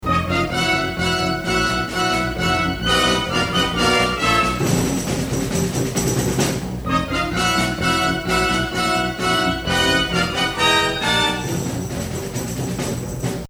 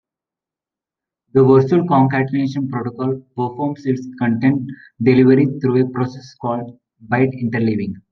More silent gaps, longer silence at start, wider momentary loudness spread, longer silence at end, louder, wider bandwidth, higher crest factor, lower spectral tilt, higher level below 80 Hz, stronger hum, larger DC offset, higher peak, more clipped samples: neither; second, 0 s vs 1.35 s; second, 8 LU vs 12 LU; about the same, 0 s vs 0.1 s; about the same, -19 LUFS vs -17 LUFS; first, over 20 kHz vs 6.4 kHz; about the same, 16 dB vs 16 dB; second, -4 dB/octave vs -9.5 dB/octave; first, -36 dBFS vs -58 dBFS; neither; neither; second, -4 dBFS vs 0 dBFS; neither